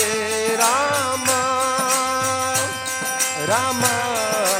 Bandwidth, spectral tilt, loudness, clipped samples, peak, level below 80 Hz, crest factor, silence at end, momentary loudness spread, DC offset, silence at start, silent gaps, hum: 17 kHz; -1.5 dB/octave; -19 LUFS; under 0.1%; -2 dBFS; -60 dBFS; 20 dB; 0 s; 3 LU; under 0.1%; 0 s; none; none